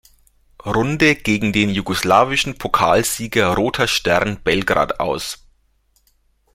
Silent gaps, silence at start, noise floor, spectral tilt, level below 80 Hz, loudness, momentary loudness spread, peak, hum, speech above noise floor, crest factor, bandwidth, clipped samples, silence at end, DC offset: none; 0.65 s; -61 dBFS; -4 dB/octave; -42 dBFS; -17 LUFS; 8 LU; 0 dBFS; none; 43 dB; 18 dB; 16.5 kHz; under 0.1%; 1.2 s; under 0.1%